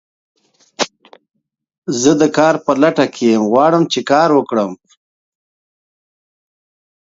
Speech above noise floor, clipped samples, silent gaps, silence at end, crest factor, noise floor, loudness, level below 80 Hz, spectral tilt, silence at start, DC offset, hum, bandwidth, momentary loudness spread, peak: over 77 dB; under 0.1%; 1.78-1.82 s; 2.3 s; 16 dB; under -90 dBFS; -14 LUFS; -62 dBFS; -4.5 dB/octave; 0.8 s; under 0.1%; none; 7.8 kHz; 10 LU; 0 dBFS